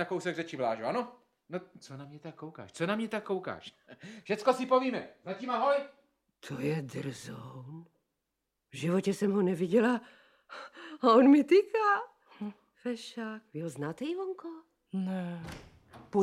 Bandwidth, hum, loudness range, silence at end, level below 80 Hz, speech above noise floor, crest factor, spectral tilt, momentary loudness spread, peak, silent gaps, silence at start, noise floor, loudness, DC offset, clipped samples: 13 kHz; none; 11 LU; 0 s; -72 dBFS; 54 dB; 22 dB; -6.5 dB/octave; 22 LU; -10 dBFS; none; 0 s; -85 dBFS; -30 LUFS; under 0.1%; under 0.1%